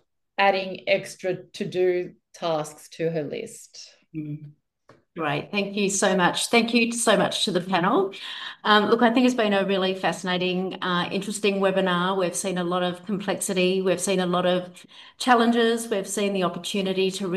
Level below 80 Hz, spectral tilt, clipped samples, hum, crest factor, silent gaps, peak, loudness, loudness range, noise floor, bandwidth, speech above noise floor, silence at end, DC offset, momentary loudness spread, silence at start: -70 dBFS; -4 dB/octave; under 0.1%; none; 20 dB; none; -4 dBFS; -23 LUFS; 8 LU; -59 dBFS; 13.5 kHz; 35 dB; 0 s; under 0.1%; 13 LU; 0.4 s